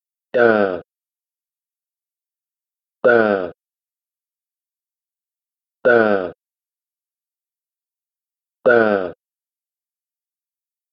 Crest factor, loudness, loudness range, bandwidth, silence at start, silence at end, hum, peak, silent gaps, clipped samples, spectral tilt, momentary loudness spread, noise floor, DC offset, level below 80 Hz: 22 dB; -17 LUFS; 2 LU; 5.8 kHz; 0.35 s; 1.8 s; none; 0 dBFS; none; under 0.1%; -4 dB/octave; 16 LU; under -90 dBFS; under 0.1%; -66 dBFS